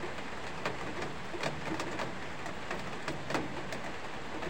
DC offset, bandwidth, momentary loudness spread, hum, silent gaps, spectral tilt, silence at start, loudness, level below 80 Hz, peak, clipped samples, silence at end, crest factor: 0.9%; 16.5 kHz; 5 LU; none; none; -4.5 dB/octave; 0 s; -39 LUFS; -58 dBFS; -16 dBFS; under 0.1%; 0 s; 22 dB